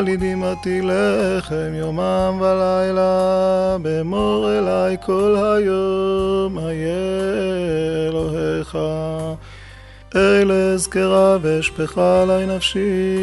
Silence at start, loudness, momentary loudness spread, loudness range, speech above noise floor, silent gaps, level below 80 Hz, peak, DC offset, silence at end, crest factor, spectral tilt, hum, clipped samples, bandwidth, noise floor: 0 s; -18 LUFS; 8 LU; 5 LU; 22 dB; none; -40 dBFS; -4 dBFS; under 0.1%; 0 s; 14 dB; -5.5 dB/octave; none; under 0.1%; 11.5 kHz; -40 dBFS